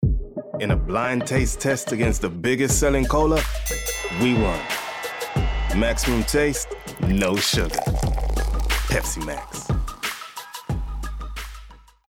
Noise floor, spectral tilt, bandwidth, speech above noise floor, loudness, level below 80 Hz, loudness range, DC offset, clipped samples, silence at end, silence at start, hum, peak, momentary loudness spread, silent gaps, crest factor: -44 dBFS; -4.5 dB/octave; 19.5 kHz; 23 dB; -23 LUFS; -28 dBFS; 5 LU; under 0.1%; under 0.1%; 0.3 s; 0 s; none; -8 dBFS; 12 LU; none; 14 dB